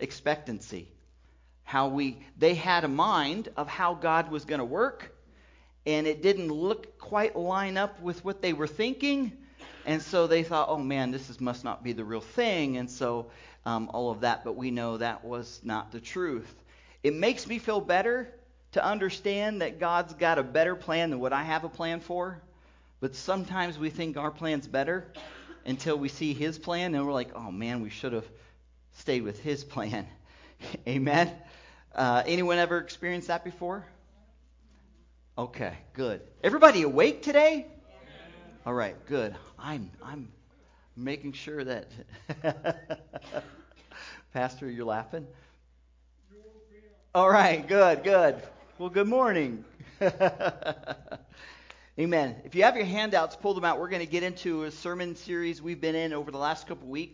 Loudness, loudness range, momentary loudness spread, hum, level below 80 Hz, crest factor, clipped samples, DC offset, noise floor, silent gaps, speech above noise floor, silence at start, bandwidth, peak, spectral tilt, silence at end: -29 LUFS; 12 LU; 17 LU; none; -60 dBFS; 26 dB; under 0.1%; under 0.1%; -62 dBFS; none; 33 dB; 0 s; 7.6 kHz; -4 dBFS; -5.5 dB/octave; 0.05 s